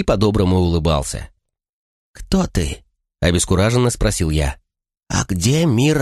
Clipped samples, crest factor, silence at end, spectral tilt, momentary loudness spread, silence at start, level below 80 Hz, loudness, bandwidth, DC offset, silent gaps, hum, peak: under 0.1%; 16 dB; 0 s; -5.5 dB/octave; 10 LU; 0 s; -28 dBFS; -18 LUFS; 13 kHz; under 0.1%; 1.69-2.14 s; none; -2 dBFS